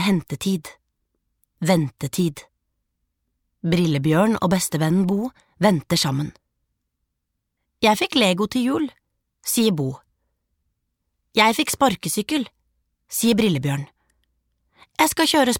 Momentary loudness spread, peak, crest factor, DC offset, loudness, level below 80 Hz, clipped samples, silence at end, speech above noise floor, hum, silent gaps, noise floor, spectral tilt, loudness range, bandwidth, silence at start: 11 LU; -2 dBFS; 20 dB; under 0.1%; -21 LUFS; -56 dBFS; under 0.1%; 0 s; 58 dB; none; none; -78 dBFS; -4.5 dB/octave; 4 LU; 19 kHz; 0 s